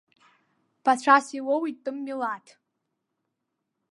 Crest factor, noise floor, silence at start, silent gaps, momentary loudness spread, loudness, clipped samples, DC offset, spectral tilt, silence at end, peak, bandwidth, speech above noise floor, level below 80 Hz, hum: 24 dB; -81 dBFS; 0.85 s; none; 14 LU; -25 LUFS; under 0.1%; under 0.1%; -2.5 dB/octave; 1.55 s; -4 dBFS; 11.5 kHz; 57 dB; -88 dBFS; none